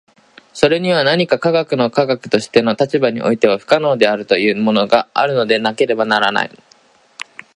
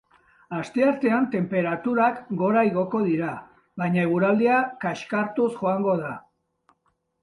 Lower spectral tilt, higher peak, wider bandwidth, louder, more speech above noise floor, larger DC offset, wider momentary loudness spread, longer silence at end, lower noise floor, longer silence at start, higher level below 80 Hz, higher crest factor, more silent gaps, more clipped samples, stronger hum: second, -5.5 dB/octave vs -8 dB/octave; first, 0 dBFS vs -8 dBFS; about the same, 11 kHz vs 11 kHz; first, -15 LUFS vs -24 LUFS; second, 36 dB vs 48 dB; neither; second, 4 LU vs 11 LU; about the same, 1.1 s vs 1 s; second, -51 dBFS vs -71 dBFS; about the same, 0.55 s vs 0.5 s; first, -58 dBFS vs -66 dBFS; about the same, 16 dB vs 16 dB; neither; neither; neither